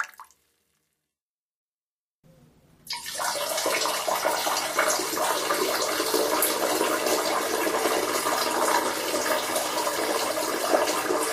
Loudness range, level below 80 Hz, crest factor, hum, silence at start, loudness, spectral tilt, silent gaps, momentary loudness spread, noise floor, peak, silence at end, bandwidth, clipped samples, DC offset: 7 LU; -66 dBFS; 20 dB; none; 0 s; -25 LUFS; -1 dB/octave; 1.21-2.23 s; 3 LU; under -90 dBFS; -8 dBFS; 0 s; 15.5 kHz; under 0.1%; under 0.1%